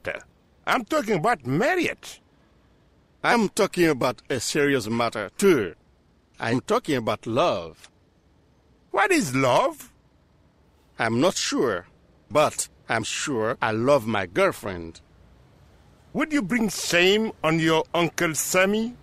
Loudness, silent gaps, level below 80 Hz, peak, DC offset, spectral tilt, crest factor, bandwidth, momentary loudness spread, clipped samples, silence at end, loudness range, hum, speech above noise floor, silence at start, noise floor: -23 LUFS; none; -56 dBFS; -6 dBFS; under 0.1%; -4 dB/octave; 20 dB; 15.5 kHz; 11 LU; under 0.1%; 0.05 s; 3 LU; none; 37 dB; 0.05 s; -60 dBFS